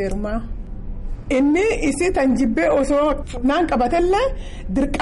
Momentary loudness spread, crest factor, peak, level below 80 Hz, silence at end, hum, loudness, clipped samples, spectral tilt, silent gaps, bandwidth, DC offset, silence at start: 17 LU; 10 dB; -8 dBFS; -30 dBFS; 0 s; none; -19 LUFS; under 0.1%; -5.5 dB/octave; none; 11.5 kHz; under 0.1%; 0 s